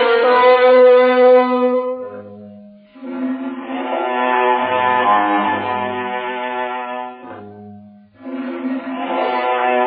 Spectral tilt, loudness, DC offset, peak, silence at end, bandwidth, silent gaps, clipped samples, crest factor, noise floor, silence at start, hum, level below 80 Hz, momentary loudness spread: -2 dB/octave; -15 LUFS; under 0.1%; 0 dBFS; 0 s; 4.8 kHz; none; under 0.1%; 16 dB; -41 dBFS; 0 s; none; -72 dBFS; 21 LU